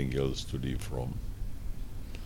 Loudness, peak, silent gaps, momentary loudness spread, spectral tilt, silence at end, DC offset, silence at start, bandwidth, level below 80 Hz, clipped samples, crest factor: -37 LUFS; -16 dBFS; none; 12 LU; -6 dB/octave; 0 s; under 0.1%; 0 s; 17 kHz; -38 dBFS; under 0.1%; 16 dB